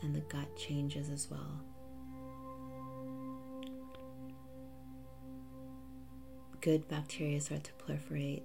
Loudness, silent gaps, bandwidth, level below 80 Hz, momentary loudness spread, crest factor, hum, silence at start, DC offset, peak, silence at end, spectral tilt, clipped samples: -42 LUFS; none; 16 kHz; -62 dBFS; 16 LU; 20 dB; none; 0 s; 0.2%; -22 dBFS; 0 s; -5.5 dB/octave; under 0.1%